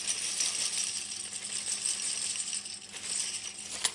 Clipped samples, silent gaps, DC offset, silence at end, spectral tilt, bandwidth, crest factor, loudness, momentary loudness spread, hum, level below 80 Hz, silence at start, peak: under 0.1%; none; under 0.1%; 0 s; 2 dB/octave; 11.5 kHz; 22 dB; -32 LUFS; 8 LU; none; -74 dBFS; 0 s; -12 dBFS